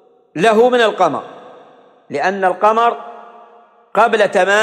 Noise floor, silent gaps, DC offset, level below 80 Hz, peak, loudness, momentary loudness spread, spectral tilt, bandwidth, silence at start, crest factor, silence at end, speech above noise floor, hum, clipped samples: -46 dBFS; none; under 0.1%; -66 dBFS; -2 dBFS; -14 LUFS; 17 LU; -4 dB/octave; 12.5 kHz; 0.35 s; 14 dB; 0 s; 33 dB; none; under 0.1%